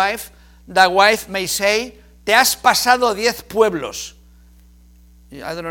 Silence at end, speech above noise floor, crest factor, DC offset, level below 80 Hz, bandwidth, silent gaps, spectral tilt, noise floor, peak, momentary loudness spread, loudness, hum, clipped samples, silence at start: 0 s; 30 dB; 18 dB; under 0.1%; -48 dBFS; 18 kHz; none; -1.5 dB/octave; -47 dBFS; 0 dBFS; 17 LU; -16 LUFS; none; under 0.1%; 0 s